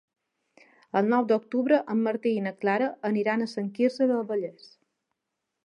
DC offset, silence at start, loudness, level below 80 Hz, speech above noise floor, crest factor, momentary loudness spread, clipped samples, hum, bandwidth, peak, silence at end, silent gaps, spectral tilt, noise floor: under 0.1%; 0.95 s; -26 LUFS; -82 dBFS; 58 dB; 18 dB; 7 LU; under 0.1%; none; 10 kHz; -10 dBFS; 1.15 s; none; -7.5 dB/octave; -83 dBFS